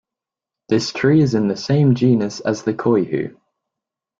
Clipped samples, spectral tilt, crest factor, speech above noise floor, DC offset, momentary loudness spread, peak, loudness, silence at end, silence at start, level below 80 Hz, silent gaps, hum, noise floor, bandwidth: under 0.1%; -7 dB/octave; 14 dB; 70 dB; under 0.1%; 8 LU; -4 dBFS; -18 LUFS; 0.9 s; 0.7 s; -56 dBFS; none; none; -87 dBFS; 7.6 kHz